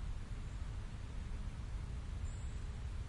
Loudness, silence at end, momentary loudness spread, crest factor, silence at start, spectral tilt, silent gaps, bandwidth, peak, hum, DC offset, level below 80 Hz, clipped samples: -47 LUFS; 0 s; 2 LU; 10 dB; 0 s; -6 dB/octave; none; 11.5 kHz; -32 dBFS; none; under 0.1%; -44 dBFS; under 0.1%